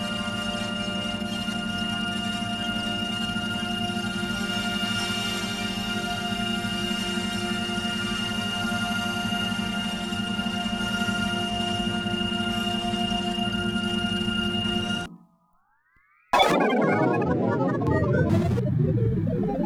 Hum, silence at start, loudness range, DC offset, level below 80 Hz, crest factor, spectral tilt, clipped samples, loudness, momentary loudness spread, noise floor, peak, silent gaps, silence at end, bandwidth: none; 0 s; 4 LU; under 0.1%; -46 dBFS; 20 dB; -5 dB/octave; under 0.1%; -26 LUFS; 6 LU; -65 dBFS; -6 dBFS; none; 0 s; 14.5 kHz